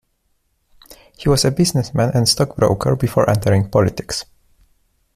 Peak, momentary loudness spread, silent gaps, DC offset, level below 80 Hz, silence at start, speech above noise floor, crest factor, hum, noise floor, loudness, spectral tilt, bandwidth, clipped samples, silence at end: -2 dBFS; 7 LU; none; under 0.1%; -40 dBFS; 0.9 s; 49 dB; 16 dB; none; -66 dBFS; -17 LUFS; -5 dB/octave; 16 kHz; under 0.1%; 0.95 s